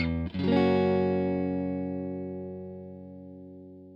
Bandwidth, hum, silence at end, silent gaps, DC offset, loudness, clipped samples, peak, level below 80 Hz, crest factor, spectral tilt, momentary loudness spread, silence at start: 5.6 kHz; 60 Hz at -80 dBFS; 0 s; none; under 0.1%; -28 LUFS; under 0.1%; -12 dBFS; -50 dBFS; 16 dB; -9.5 dB/octave; 22 LU; 0 s